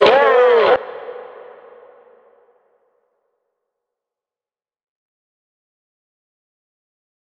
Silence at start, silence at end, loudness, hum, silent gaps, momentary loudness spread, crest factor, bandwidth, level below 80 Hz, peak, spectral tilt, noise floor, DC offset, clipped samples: 0 s; 6.15 s; -13 LUFS; none; none; 24 LU; 20 dB; 6.8 kHz; -66 dBFS; 0 dBFS; -4.5 dB/octave; under -90 dBFS; under 0.1%; under 0.1%